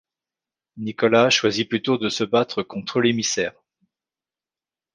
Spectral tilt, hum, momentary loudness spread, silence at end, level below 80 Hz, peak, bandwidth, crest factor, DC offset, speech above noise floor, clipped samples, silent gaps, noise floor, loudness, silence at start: -3.5 dB/octave; none; 11 LU; 1.45 s; -64 dBFS; -4 dBFS; 10 kHz; 18 dB; under 0.1%; over 69 dB; under 0.1%; none; under -90 dBFS; -21 LUFS; 0.75 s